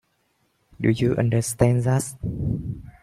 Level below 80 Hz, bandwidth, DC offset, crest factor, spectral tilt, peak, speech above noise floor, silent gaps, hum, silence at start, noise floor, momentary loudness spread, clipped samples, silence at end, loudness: -44 dBFS; 14 kHz; under 0.1%; 20 dB; -6.5 dB/octave; -4 dBFS; 47 dB; none; none; 0.8 s; -68 dBFS; 10 LU; under 0.1%; 0.1 s; -23 LUFS